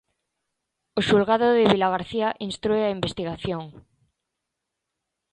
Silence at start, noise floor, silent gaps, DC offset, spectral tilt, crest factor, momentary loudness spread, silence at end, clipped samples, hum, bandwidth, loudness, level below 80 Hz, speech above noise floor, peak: 0.95 s; -83 dBFS; none; under 0.1%; -6 dB/octave; 24 dB; 12 LU; 1.6 s; under 0.1%; none; 10 kHz; -23 LUFS; -54 dBFS; 60 dB; -2 dBFS